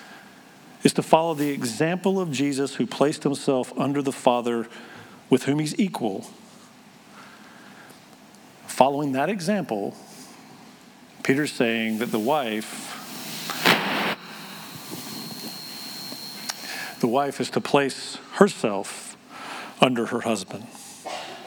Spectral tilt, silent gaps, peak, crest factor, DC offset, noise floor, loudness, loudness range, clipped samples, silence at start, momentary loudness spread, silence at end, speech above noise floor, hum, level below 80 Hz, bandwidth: -4.5 dB/octave; none; 0 dBFS; 26 dB; under 0.1%; -49 dBFS; -25 LUFS; 5 LU; under 0.1%; 0 s; 21 LU; 0 s; 26 dB; none; -74 dBFS; over 20 kHz